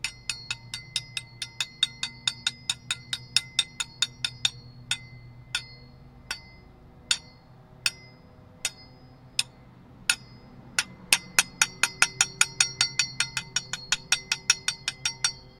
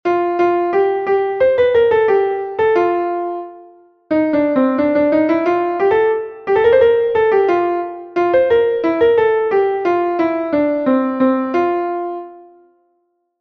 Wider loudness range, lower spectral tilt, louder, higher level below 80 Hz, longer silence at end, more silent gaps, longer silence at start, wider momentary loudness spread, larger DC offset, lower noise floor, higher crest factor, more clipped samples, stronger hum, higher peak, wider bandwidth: first, 9 LU vs 3 LU; second, 0.5 dB/octave vs -7.5 dB/octave; second, -27 LUFS vs -15 LUFS; second, -58 dBFS vs -52 dBFS; second, 0.1 s vs 1 s; neither; about the same, 0.05 s vs 0.05 s; first, 12 LU vs 8 LU; neither; second, -52 dBFS vs -65 dBFS; first, 30 dB vs 14 dB; neither; neither; about the same, 0 dBFS vs 0 dBFS; first, 17.5 kHz vs 6.2 kHz